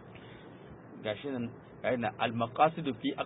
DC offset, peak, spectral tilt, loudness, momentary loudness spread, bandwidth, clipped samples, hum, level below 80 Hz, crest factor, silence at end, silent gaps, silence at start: under 0.1%; -12 dBFS; -2.5 dB/octave; -33 LUFS; 22 LU; 3.9 kHz; under 0.1%; none; -66 dBFS; 22 dB; 0 s; none; 0 s